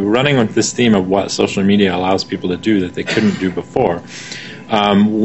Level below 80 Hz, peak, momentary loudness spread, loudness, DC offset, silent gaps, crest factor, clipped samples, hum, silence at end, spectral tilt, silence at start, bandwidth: -48 dBFS; 0 dBFS; 8 LU; -15 LUFS; 0.4%; none; 14 dB; under 0.1%; none; 0 s; -5 dB/octave; 0 s; 8.4 kHz